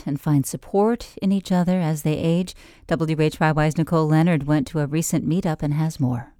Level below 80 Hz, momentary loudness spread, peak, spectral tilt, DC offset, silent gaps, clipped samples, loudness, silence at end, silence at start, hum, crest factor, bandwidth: -46 dBFS; 5 LU; -6 dBFS; -6.5 dB/octave; under 0.1%; none; under 0.1%; -21 LUFS; 0.15 s; 0.05 s; none; 14 dB; 16.5 kHz